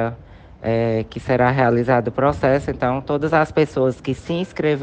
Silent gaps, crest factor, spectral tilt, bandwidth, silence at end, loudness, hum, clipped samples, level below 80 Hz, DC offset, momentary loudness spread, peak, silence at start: none; 16 dB; -8 dB/octave; 9 kHz; 0 s; -20 LUFS; none; under 0.1%; -42 dBFS; under 0.1%; 8 LU; -4 dBFS; 0 s